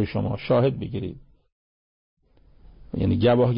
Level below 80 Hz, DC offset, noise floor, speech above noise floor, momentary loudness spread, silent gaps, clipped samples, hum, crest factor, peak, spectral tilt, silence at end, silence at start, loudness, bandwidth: -44 dBFS; under 0.1%; -53 dBFS; 31 dB; 14 LU; 1.52-2.17 s; under 0.1%; none; 16 dB; -10 dBFS; -12 dB/octave; 0 s; 0 s; -24 LUFS; 5.4 kHz